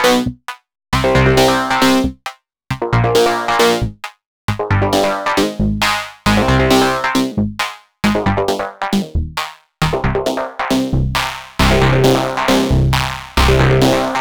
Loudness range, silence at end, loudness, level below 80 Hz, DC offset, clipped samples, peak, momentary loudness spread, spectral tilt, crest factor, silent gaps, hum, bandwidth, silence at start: 4 LU; 0 s; -15 LUFS; -26 dBFS; under 0.1%; under 0.1%; 0 dBFS; 12 LU; -5 dB/octave; 16 dB; 4.26-4.48 s; none; over 20 kHz; 0 s